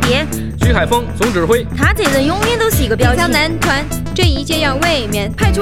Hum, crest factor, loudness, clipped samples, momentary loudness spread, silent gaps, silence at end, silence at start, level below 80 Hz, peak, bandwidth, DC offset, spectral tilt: none; 14 dB; -14 LUFS; under 0.1%; 4 LU; none; 0 s; 0 s; -22 dBFS; 0 dBFS; 17 kHz; 3%; -4.5 dB/octave